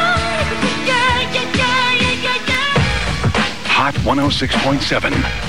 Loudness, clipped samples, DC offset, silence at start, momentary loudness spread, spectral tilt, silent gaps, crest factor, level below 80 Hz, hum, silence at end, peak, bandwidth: -15 LUFS; under 0.1%; 3%; 0 s; 3 LU; -4 dB/octave; none; 14 dB; -30 dBFS; none; 0 s; -2 dBFS; 16.5 kHz